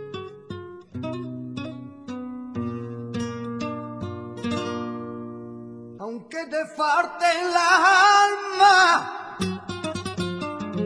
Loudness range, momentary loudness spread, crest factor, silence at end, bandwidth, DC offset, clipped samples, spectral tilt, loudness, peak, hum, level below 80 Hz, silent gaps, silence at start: 14 LU; 21 LU; 20 dB; 0 s; 11 kHz; under 0.1%; under 0.1%; -3.5 dB/octave; -22 LUFS; -4 dBFS; none; -60 dBFS; none; 0 s